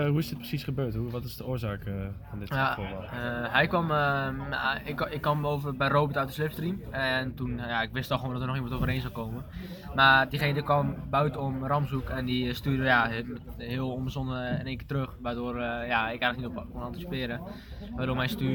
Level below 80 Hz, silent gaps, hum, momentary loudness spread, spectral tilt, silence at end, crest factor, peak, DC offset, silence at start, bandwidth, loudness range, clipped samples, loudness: -46 dBFS; none; none; 11 LU; -6.5 dB/octave; 0 s; 22 dB; -8 dBFS; under 0.1%; 0 s; 19 kHz; 5 LU; under 0.1%; -29 LUFS